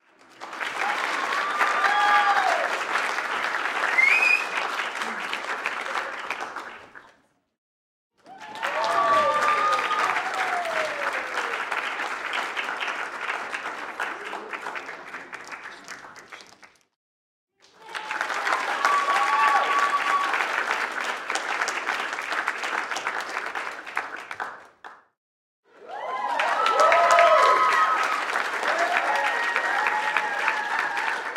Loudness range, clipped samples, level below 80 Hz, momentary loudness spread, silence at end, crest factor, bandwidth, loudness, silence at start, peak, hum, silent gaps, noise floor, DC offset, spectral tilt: 13 LU; under 0.1%; -76 dBFS; 17 LU; 0 s; 22 dB; 16.5 kHz; -24 LUFS; 0.4 s; -4 dBFS; none; 7.58-8.10 s, 16.96-17.47 s, 25.17-25.63 s; -61 dBFS; under 0.1%; -0.5 dB/octave